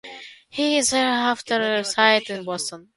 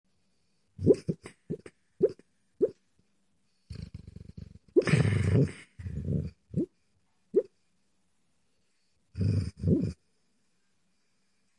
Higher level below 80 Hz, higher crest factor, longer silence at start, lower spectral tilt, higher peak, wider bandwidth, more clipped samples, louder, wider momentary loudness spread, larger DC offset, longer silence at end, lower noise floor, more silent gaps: second, -64 dBFS vs -54 dBFS; about the same, 20 dB vs 22 dB; second, 0.05 s vs 0.8 s; second, -2 dB/octave vs -8 dB/octave; first, -2 dBFS vs -10 dBFS; about the same, 11.5 kHz vs 11 kHz; neither; first, -21 LUFS vs -30 LUFS; second, 14 LU vs 22 LU; neither; second, 0.15 s vs 1.65 s; second, -41 dBFS vs -77 dBFS; neither